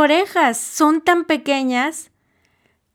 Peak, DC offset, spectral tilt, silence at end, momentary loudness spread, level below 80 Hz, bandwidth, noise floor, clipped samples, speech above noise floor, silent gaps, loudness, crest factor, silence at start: -2 dBFS; under 0.1%; -1.5 dB/octave; 0.9 s; 6 LU; -66 dBFS; 17.5 kHz; -63 dBFS; under 0.1%; 46 dB; none; -17 LUFS; 16 dB; 0 s